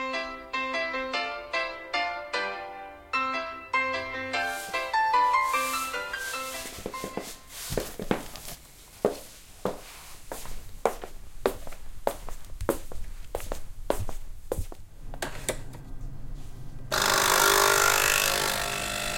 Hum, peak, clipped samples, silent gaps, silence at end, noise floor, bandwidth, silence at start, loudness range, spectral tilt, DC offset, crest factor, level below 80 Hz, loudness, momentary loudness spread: none; -6 dBFS; under 0.1%; none; 0 s; -49 dBFS; 17 kHz; 0 s; 12 LU; -1.5 dB/octave; under 0.1%; 24 dB; -42 dBFS; -28 LUFS; 23 LU